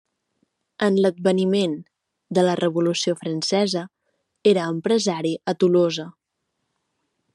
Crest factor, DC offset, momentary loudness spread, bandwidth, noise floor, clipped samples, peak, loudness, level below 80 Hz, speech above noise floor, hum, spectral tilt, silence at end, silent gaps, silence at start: 18 dB; under 0.1%; 7 LU; 11.5 kHz; -77 dBFS; under 0.1%; -4 dBFS; -21 LUFS; -72 dBFS; 57 dB; none; -5.5 dB/octave; 1.25 s; none; 0.8 s